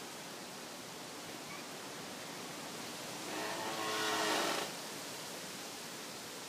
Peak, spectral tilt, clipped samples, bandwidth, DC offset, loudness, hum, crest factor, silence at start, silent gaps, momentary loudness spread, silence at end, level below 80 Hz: -22 dBFS; -1.5 dB/octave; under 0.1%; 15.5 kHz; under 0.1%; -40 LUFS; none; 20 dB; 0 s; none; 12 LU; 0 s; -82 dBFS